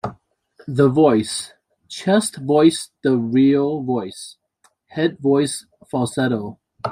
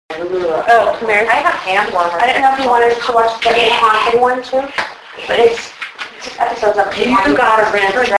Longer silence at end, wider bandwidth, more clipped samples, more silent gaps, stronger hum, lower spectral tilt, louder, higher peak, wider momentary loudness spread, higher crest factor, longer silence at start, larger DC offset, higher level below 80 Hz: about the same, 0 s vs 0 s; first, 16 kHz vs 11 kHz; neither; neither; neither; first, -5.5 dB/octave vs -3 dB/octave; second, -19 LUFS vs -13 LUFS; about the same, -2 dBFS vs 0 dBFS; first, 17 LU vs 11 LU; about the same, 18 dB vs 14 dB; about the same, 0.05 s vs 0.1 s; neither; second, -60 dBFS vs -46 dBFS